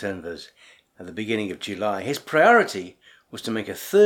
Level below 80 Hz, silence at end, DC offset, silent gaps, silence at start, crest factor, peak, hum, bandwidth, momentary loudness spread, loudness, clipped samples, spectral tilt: -66 dBFS; 0 s; under 0.1%; none; 0 s; 20 dB; -4 dBFS; none; 18.5 kHz; 22 LU; -23 LUFS; under 0.1%; -4.5 dB/octave